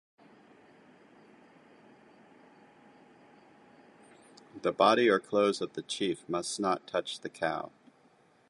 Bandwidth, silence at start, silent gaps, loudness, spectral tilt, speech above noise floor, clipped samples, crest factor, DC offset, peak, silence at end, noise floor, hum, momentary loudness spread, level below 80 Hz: 11.5 kHz; 4.55 s; none; -30 LUFS; -4 dB/octave; 35 dB; under 0.1%; 24 dB; under 0.1%; -10 dBFS; 0.8 s; -64 dBFS; none; 13 LU; -76 dBFS